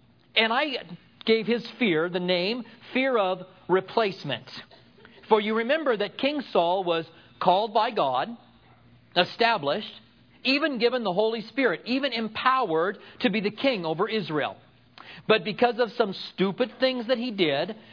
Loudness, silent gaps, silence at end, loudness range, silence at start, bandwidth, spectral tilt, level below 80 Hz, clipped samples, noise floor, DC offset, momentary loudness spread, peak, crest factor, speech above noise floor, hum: -26 LUFS; none; 0 s; 2 LU; 0.35 s; 5.4 kHz; -6.5 dB/octave; -74 dBFS; under 0.1%; -56 dBFS; under 0.1%; 9 LU; -4 dBFS; 22 dB; 30 dB; none